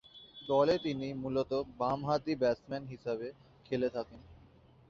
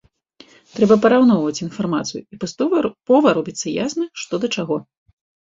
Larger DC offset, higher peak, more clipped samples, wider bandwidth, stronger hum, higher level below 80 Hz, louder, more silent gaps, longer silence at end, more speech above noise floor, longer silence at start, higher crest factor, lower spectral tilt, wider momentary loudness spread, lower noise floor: neither; second, -16 dBFS vs -2 dBFS; neither; about the same, 7.4 kHz vs 7.8 kHz; neither; about the same, -64 dBFS vs -60 dBFS; second, -34 LUFS vs -18 LUFS; neither; about the same, 0.55 s vs 0.65 s; second, 27 dB vs 32 dB; second, 0.15 s vs 0.75 s; about the same, 20 dB vs 18 dB; first, -7 dB/octave vs -5.5 dB/octave; about the same, 13 LU vs 13 LU; first, -61 dBFS vs -50 dBFS